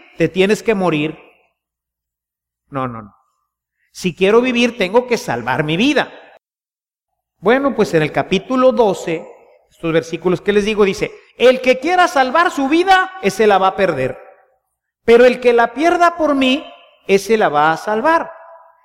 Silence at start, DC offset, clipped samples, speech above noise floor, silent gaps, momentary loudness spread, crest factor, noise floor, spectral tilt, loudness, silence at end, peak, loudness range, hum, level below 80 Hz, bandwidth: 0.2 s; under 0.1%; under 0.1%; over 76 dB; none; 11 LU; 16 dB; under -90 dBFS; -5 dB/octave; -15 LUFS; 0.3 s; 0 dBFS; 6 LU; none; -48 dBFS; 15.5 kHz